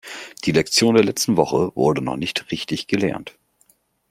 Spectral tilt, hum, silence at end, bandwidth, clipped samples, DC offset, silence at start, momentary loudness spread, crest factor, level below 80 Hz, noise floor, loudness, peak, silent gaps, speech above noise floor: -4.5 dB/octave; none; 0.8 s; 16 kHz; under 0.1%; under 0.1%; 0.05 s; 10 LU; 18 dB; -54 dBFS; -61 dBFS; -20 LUFS; -2 dBFS; none; 41 dB